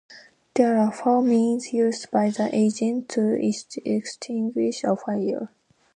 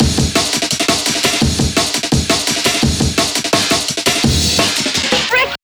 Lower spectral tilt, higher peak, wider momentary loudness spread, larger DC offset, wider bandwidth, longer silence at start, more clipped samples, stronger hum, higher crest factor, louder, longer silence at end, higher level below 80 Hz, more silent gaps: first, -6 dB/octave vs -3 dB/octave; second, -6 dBFS vs 0 dBFS; first, 8 LU vs 2 LU; neither; second, 10 kHz vs over 20 kHz; about the same, 0.1 s vs 0 s; neither; neither; about the same, 18 dB vs 14 dB; second, -23 LUFS vs -13 LUFS; first, 0.5 s vs 0.1 s; second, -74 dBFS vs -28 dBFS; neither